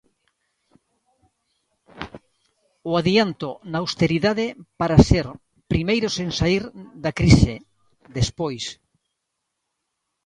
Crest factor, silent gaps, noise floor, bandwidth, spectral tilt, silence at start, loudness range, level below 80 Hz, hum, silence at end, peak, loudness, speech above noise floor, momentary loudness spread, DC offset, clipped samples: 22 dB; none; -79 dBFS; 11 kHz; -6 dB/octave; 1.95 s; 7 LU; -36 dBFS; none; 1.55 s; 0 dBFS; -21 LUFS; 59 dB; 20 LU; under 0.1%; under 0.1%